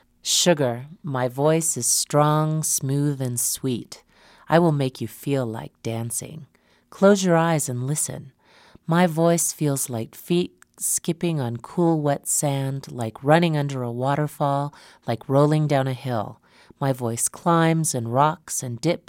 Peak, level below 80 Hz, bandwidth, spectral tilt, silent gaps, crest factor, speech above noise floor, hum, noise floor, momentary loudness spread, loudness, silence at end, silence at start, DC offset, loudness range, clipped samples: -4 dBFS; -64 dBFS; 16.5 kHz; -4.5 dB/octave; none; 20 dB; 31 dB; none; -53 dBFS; 11 LU; -22 LUFS; 0.1 s; 0.25 s; under 0.1%; 3 LU; under 0.1%